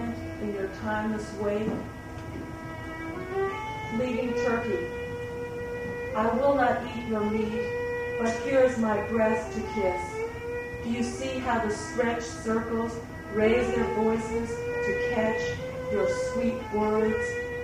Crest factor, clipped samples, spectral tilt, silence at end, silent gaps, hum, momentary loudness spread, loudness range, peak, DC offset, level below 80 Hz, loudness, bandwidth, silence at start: 18 dB; under 0.1%; -6 dB/octave; 0 s; none; none; 11 LU; 5 LU; -12 dBFS; under 0.1%; -48 dBFS; -29 LUFS; 15.5 kHz; 0 s